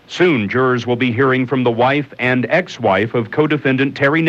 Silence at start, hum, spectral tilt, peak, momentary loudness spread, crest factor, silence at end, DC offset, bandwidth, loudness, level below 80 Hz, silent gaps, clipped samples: 0.1 s; none; -7 dB/octave; -2 dBFS; 3 LU; 14 dB; 0 s; under 0.1%; 7.8 kHz; -16 LUFS; -58 dBFS; none; under 0.1%